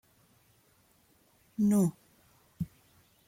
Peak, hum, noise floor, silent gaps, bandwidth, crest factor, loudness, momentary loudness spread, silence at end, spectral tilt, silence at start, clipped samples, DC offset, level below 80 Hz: -18 dBFS; none; -67 dBFS; none; 16 kHz; 18 dB; -31 LUFS; 15 LU; 0.6 s; -8 dB/octave; 1.6 s; under 0.1%; under 0.1%; -66 dBFS